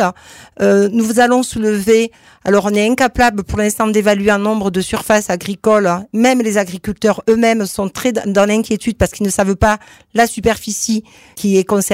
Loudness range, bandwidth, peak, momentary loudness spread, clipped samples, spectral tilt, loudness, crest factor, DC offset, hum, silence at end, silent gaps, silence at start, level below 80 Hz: 2 LU; 16 kHz; -2 dBFS; 6 LU; under 0.1%; -4.5 dB/octave; -15 LUFS; 12 dB; under 0.1%; none; 0 s; none; 0 s; -36 dBFS